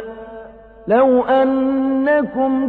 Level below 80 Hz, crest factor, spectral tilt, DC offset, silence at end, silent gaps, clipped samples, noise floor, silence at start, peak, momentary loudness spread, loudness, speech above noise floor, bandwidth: -50 dBFS; 12 dB; -8.5 dB/octave; under 0.1%; 0 s; none; under 0.1%; -38 dBFS; 0 s; -4 dBFS; 20 LU; -16 LUFS; 23 dB; 4.4 kHz